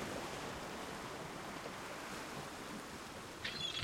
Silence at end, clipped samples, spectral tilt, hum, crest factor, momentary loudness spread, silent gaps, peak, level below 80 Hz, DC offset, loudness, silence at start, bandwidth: 0 s; under 0.1%; -3 dB/octave; none; 20 dB; 5 LU; none; -26 dBFS; -66 dBFS; under 0.1%; -45 LUFS; 0 s; 16.5 kHz